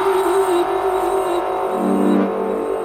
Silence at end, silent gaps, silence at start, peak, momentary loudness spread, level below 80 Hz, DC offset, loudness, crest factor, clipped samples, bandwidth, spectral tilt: 0 s; none; 0 s; -6 dBFS; 4 LU; -50 dBFS; under 0.1%; -18 LUFS; 12 dB; under 0.1%; 16 kHz; -6 dB/octave